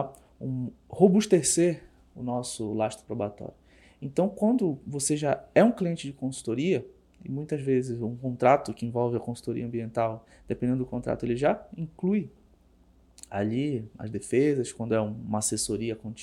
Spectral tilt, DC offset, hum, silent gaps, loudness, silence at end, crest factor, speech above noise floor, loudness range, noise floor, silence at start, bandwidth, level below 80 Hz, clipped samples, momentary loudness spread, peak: -5.5 dB/octave; under 0.1%; none; none; -28 LUFS; 0 s; 22 dB; 32 dB; 4 LU; -60 dBFS; 0 s; 15 kHz; -58 dBFS; under 0.1%; 15 LU; -6 dBFS